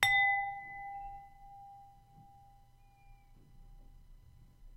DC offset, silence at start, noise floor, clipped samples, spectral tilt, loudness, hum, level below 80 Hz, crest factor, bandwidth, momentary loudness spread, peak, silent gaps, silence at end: under 0.1%; 0 s; -62 dBFS; under 0.1%; -0.5 dB/octave; -33 LUFS; none; -60 dBFS; 30 dB; 16 kHz; 28 LU; -8 dBFS; none; 0 s